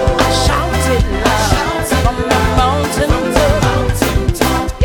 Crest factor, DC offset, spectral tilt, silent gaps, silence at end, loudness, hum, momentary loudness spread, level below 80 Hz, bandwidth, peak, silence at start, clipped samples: 12 dB; under 0.1%; -5 dB/octave; none; 0 s; -14 LUFS; none; 3 LU; -20 dBFS; 19.5 kHz; 0 dBFS; 0 s; under 0.1%